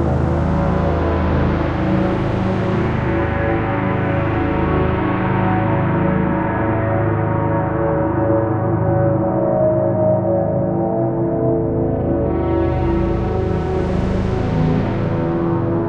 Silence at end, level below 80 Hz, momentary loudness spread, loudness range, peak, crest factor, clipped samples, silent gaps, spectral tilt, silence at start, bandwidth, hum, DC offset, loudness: 0 s; -28 dBFS; 2 LU; 1 LU; -4 dBFS; 12 dB; under 0.1%; none; -10 dB/octave; 0 s; 6.8 kHz; none; under 0.1%; -18 LUFS